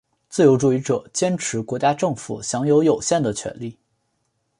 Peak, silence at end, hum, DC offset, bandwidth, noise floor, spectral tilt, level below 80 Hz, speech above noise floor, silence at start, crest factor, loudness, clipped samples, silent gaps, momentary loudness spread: -4 dBFS; 0.9 s; none; under 0.1%; 11.5 kHz; -71 dBFS; -5.5 dB/octave; -58 dBFS; 51 dB; 0.3 s; 18 dB; -20 LUFS; under 0.1%; none; 12 LU